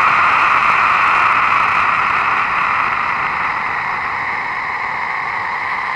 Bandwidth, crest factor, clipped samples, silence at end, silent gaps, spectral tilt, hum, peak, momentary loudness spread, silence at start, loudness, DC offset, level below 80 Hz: 11.5 kHz; 14 dB; under 0.1%; 0 s; none; -3 dB/octave; none; -2 dBFS; 8 LU; 0 s; -15 LUFS; under 0.1%; -48 dBFS